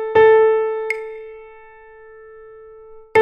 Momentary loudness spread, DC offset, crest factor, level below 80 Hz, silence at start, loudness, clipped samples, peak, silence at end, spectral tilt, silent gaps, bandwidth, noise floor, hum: 25 LU; under 0.1%; 16 dB; -54 dBFS; 0 s; -16 LUFS; under 0.1%; -2 dBFS; 0 s; -5 dB/octave; none; 8.8 kHz; -43 dBFS; none